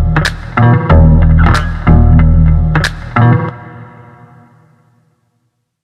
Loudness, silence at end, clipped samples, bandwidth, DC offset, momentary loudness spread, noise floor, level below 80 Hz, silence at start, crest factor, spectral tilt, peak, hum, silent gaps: -10 LUFS; 2 s; under 0.1%; 10.5 kHz; under 0.1%; 7 LU; -63 dBFS; -14 dBFS; 0 s; 10 dB; -7.5 dB/octave; 0 dBFS; none; none